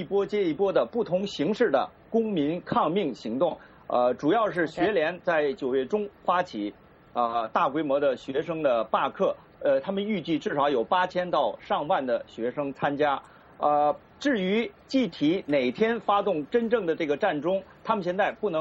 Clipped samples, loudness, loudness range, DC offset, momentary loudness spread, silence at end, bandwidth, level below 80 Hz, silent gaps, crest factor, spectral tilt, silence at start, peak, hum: under 0.1%; -27 LUFS; 1 LU; under 0.1%; 5 LU; 0 s; 7.8 kHz; -64 dBFS; none; 16 dB; -6.5 dB/octave; 0 s; -10 dBFS; none